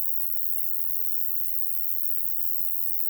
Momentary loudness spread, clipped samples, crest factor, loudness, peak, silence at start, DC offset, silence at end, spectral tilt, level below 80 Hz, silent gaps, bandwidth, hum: 0 LU; under 0.1%; 16 dB; -23 LUFS; -10 dBFS; 0 s; under 0.1%; 0 s; -1 dB/octave; -58 dBFS; none; over 20 kHz; 50 Hz at -60 dBFS